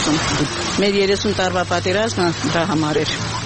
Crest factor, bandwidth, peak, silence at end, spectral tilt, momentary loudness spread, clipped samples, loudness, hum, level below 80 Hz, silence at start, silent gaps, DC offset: 16 dB; 8.8 kHz; -2 dBFS; 0 s; -4 dB/octave; 3 LU; under 0.1%; -18 LUFS; none; -40 dBFS; 0 s; none; 0.2%